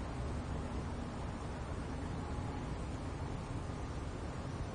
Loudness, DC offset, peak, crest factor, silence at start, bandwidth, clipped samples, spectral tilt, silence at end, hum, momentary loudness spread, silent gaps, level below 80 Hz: -42 LUFS; under 0.1%; -28 dBFS; 12 dB; 0 s; 10 kHz; under 0.1%; -6.5 dB/octave; 0 s; none; 2 LU; none; -46 dBFS